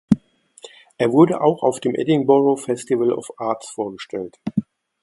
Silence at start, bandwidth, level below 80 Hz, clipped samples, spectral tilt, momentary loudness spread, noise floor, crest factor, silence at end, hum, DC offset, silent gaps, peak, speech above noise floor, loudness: 0.1 s; 11.5 kHz; -56 dBFS; under 0.1%; -6.5 dB/octave; 13 LU; -46 dBFS; 20 dB; 0.4 s; none; under 0.1%; none; 0 dBFS; 27 dB; -20 LUFS